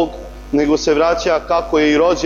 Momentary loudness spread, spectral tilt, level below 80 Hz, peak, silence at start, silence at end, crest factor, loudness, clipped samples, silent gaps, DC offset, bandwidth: 8 LU; -4.5 dB/octave; -36 dBFS; -4 dBFS; 0 s; 0 s; 12 dB; -15 LUFS; under 0.1%; none; under 0.1%; 7.4 kHz